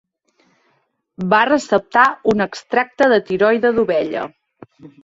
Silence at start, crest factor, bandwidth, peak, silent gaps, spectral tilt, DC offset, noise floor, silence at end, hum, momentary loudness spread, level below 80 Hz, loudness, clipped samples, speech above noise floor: 1.2 s; 16 dB; 8 kHz; -2 dBFS; none; -5.5 dB/octave; under 0.1%; -65 dBFS; 0.15 s; none; 9 LU; -56 dBFS; -16 LUFS; under 0.1%; 49 dB